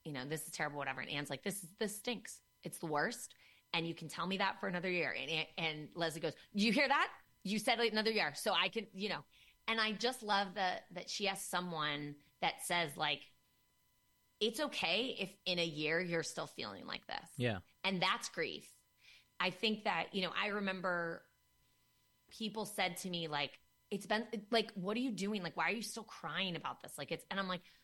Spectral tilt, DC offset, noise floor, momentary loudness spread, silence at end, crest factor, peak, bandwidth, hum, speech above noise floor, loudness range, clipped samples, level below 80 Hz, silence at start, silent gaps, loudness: -3.5 dB/octave; under 0.1%; -76 dBFS; 10 LU; 0.15 s; 20 dB; -20 dBFS; 16.5 kHz; none; 37 dB; 5 LU; under 0.1%; -76 dBFS; 0.05 s; none; -38 LUFS